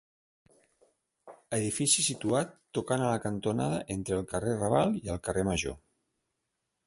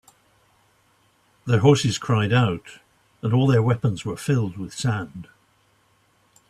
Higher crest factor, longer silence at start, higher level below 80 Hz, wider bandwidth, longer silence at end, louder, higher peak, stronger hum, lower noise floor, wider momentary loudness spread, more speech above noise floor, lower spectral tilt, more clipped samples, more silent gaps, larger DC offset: about the same, 20 dB vs 20 dB; second, 1.25 s vs 1.45 s; about the same, -54 dBFS vs -56 dBFS; about the same, 12 kHz vs 12.5 kHz; second, 1.1 s vs 1.25 s; second, -30 LUFS vs -22 LUFS; second, -12 dBFS vs -4 dBFS; neither; first, -83 dBFS vs -62 dBFS; second, 9 LU vs 14 LU; first, 53 dB vs 42 dB; second, -4 dB/octave vs -6.5 dB/octave; neither; neither; neither